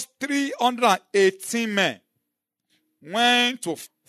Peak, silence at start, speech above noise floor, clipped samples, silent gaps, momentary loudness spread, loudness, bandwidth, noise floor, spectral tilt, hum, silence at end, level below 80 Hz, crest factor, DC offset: -6 dBFS; 0 s; 59 dB; under 0.1%; none; 12 LU; -22 LUFS; 13.5 kHz; -82 dBFS; -2.5 dB/octave; none; 0.2 s; -82 dBFS; 18 dB; under 0.1%